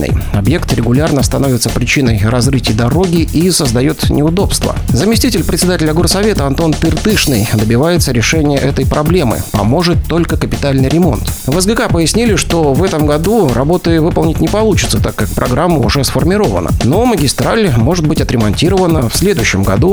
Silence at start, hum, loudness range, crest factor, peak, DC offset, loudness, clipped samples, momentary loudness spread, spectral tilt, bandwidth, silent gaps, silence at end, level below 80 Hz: 0 s; none; 1 LU; 10 dB; 0 dBFS; 0.1%; -11 LUFS; under 0.1%; 3 LU; -5.5 dB/octave; over 20 kHz; none; 0 s; -22 dBFS